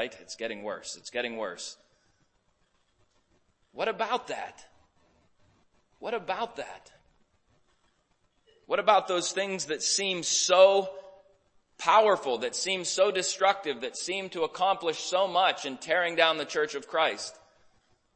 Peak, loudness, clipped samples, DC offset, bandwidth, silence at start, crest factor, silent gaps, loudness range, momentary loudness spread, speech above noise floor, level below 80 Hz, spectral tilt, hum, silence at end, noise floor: -6 dBFS; -27 LUFS; under 0.1%; under 0.1%; 8.8 kHz; 0 s; 24 dB; none; 14 LU; 15 LU; 43 dB; -74 dBFS; -1.5 dB/octave; none; 0.8 s; -71 dBFS